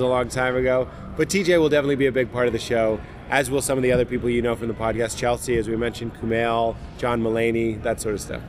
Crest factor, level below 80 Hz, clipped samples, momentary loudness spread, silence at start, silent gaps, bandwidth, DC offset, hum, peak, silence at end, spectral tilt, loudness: 18 dB; -40 dBFS; under 0.1%; 7 LU; 0 s; none; 16 kHz; under 0.1%; none; -4 dBFS; 0 s; -5 dB/octave; -22 LUFS